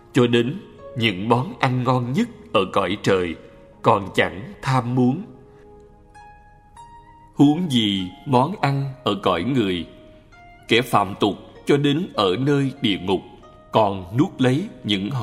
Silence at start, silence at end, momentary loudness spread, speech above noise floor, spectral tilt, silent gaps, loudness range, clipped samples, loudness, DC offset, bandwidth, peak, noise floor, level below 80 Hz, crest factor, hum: 0.15 s; 0 s; 8 LU; 27 dB; -6.5 dB/octave; none; 3 LU; under 0.1%; -21 LUFS; under 0.1%; 15.5 kHz; -2 dBFS; -48 dBFS; -52 dBFS; 20 dB; none